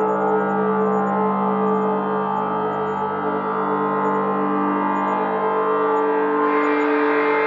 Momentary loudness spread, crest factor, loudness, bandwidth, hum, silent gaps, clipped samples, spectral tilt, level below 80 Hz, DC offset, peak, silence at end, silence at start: 4 LU; 12 dB; -20 LUFS; 7.4 kHz; 50 Hz at -70 dBFS; none; under 0.1%; -8.5 dB/octave; -72 dBFS; under 0.1%; -8 dBFS; 0 s; 0 s